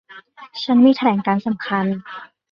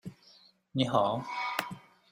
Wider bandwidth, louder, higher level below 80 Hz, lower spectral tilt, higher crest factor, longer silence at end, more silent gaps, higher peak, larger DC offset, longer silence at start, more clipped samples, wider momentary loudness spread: second, 6.2 kHz vs 15.5 kHz; first, -18 LUFS vs -31 LUFS; first, -64 dBFS vs -70 dBFS; first, -7.5 dB/octave vs -5.5 dB/octave; second, 16 dB vs 24 dB; about the same, 0.25 s vs 0.35 s; neither; first, -2 dBFS vs -10 dBFS; neither; about the same, 0.1 s vs 0.05 s; neither; about the same, 21 LU vs 19 LU